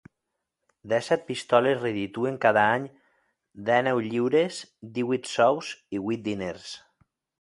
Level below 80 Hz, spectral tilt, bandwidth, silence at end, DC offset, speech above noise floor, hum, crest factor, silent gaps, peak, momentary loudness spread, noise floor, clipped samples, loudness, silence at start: -66 dBFS; -5 dB/octave; 11.5 kHz; 0.6 s; under 0.1%; 57 dB; none; 22 dB; none; -6 dBFS; 13 LU; -83 dBFS; under 0.1%; -26 LUFS; 0.85 s